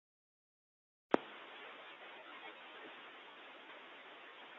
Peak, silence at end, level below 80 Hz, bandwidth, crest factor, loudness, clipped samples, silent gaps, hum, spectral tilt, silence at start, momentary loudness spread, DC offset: -14 dBFS; 0 s; -90 dBFS; 7.2 kHz; 36 dB; -47 LUFS; under 0.1%; none; none; -1.5 dB/octave; 1.1 s; 15 LU; under 0.1%